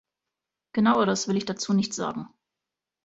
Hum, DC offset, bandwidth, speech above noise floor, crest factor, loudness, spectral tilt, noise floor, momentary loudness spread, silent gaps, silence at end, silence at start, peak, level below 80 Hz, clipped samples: none; under 0.1%; 8 kHz; 63 dB; 18 dB; -25 LUFS; -4.5 dB/octave; -87 dBFS; 12 LU; none; 0.8 s; 0.75 s; -10 dBFS; -66 dBFS; under 0.1%